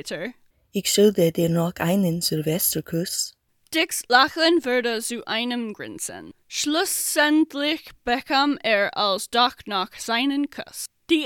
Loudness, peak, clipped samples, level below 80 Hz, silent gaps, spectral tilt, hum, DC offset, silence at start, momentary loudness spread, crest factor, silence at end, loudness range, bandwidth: -22 LUFS; 0 dBFS; under 0.1%; -60 dBFS; none; -3.5 dB/octave; none; under 0.1%; 0.05 s; 13 LU; 22 dB; 0 s; 2 LU; 18 kHz